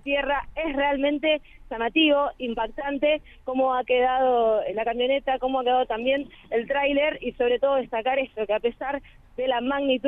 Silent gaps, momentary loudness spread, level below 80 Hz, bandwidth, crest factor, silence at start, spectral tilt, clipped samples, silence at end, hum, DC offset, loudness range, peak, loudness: none; 8 LU; -50 dBFS; 3.9 kHz; 16 dB; 0.05 s; -6.5 dB/octave; under 0.1%; 0 s; none; under 0.1%; 2 LU; -10 dBFS; -24 LUFS